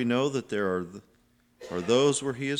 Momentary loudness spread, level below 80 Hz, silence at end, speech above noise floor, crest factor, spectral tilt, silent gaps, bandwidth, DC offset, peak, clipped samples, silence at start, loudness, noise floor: 15 LU; -66 dBFS; 0 s; 38 dB; 18 dB; -4.5 dB/octave; none; 12 kHz; under 0.1%; -10 dBFS; under 0.1%; 0 s; -27 LUFS; -65 dBFS